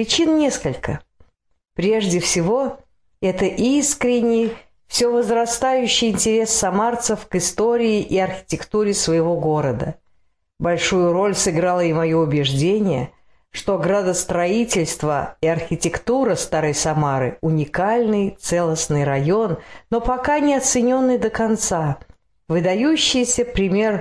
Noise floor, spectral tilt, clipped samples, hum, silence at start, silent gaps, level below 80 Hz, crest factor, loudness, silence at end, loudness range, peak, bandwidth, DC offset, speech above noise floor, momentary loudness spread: -63 dBFS; -4 dB/octave; under 0.1%; none; 0 s; none; -44 dBFS; 14 dB; -19 LUFS; 0 s; 2 LU; -6 dBFS; 11 kHz; 0.1%; 44 dB; 7 LU